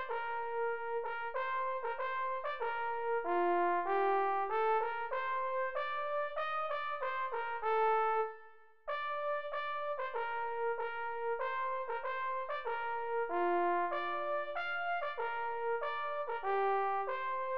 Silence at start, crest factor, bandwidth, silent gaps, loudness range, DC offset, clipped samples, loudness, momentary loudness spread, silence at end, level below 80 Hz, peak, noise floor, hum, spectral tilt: 0 s; 14 dB; 5.6 kHz; none; 4 LU; 0.4%; under 0.1%; -36 LUFS; 6 LU; 0 s; -74 dBFS; -22 dBFS; -60 dBFS; none; -0.5 dB/octave